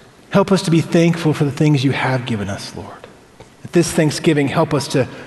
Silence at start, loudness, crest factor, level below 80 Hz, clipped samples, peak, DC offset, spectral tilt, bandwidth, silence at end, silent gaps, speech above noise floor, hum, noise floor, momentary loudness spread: 0.3 s; -17 LUFS; 16 dB; -50 dBFS; under 0.1%; -2 dBFS; under 0.1%; -6 dB/octave; 12.5 kHz; 0 s; none; 27 dB; none; -44 dBFS; 10 LU